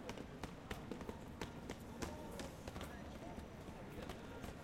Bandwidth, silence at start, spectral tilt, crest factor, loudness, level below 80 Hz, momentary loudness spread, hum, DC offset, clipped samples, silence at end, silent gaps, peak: 16.5 kHz; 0 s; -5 dB/octave; 24 dB; -51 LUFS; -60 dBFS; 3 LU; none; under 0.1%; under 0.1%; 0 s; none; -26 dBFS